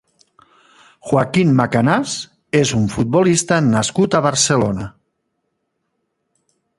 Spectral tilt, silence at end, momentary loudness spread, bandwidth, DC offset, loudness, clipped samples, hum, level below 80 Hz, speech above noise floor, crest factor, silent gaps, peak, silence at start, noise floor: -5 dB/octave; 1.9 s; 10 LU; 11.5 kHz; under 0.1%; -16 LUFS; under 0.1%; none; -48 dBFS; 56 dB; 18 dB; none; 0 dBFS; 1.05 s; -72 dBFS